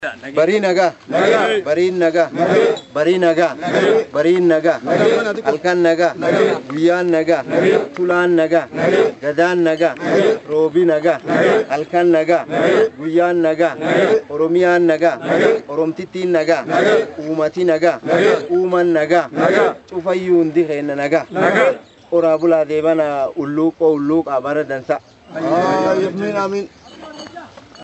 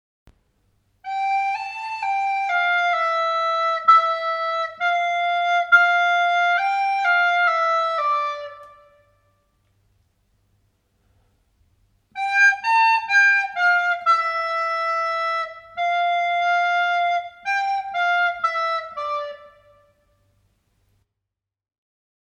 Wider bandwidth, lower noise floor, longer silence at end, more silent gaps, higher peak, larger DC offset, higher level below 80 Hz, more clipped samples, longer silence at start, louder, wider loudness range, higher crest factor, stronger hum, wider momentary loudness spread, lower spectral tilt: second, 8.2 kHz vs 10 kHz; second, -36 dBFS vs -84 dBFS; second, 0 s vs 2.9 s; neither; first, 0 dBFS vs -4 dBFS; neither; first, -62 dBFS vs -68 dBFS; neither; second, 0 s vs 1.05 s; first, -15 LUFS vs -20 LUFS; second, 2 LU vs 8 LU; about the same, 16 dB vs 18 dB; neither; second, 6 LU vs 12 LU; first, -6 dB/octave vs 1 dB/octave